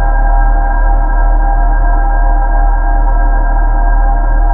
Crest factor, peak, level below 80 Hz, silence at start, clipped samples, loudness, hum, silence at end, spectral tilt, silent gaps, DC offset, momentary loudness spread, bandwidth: 8 dB; 0 dBFS; -8 dBFS; 0 s; under 0.1%; -14 LUFS; none; 0 s; -12.5 dB/octave; none; under 0.1%; 1 LU; 2 kHz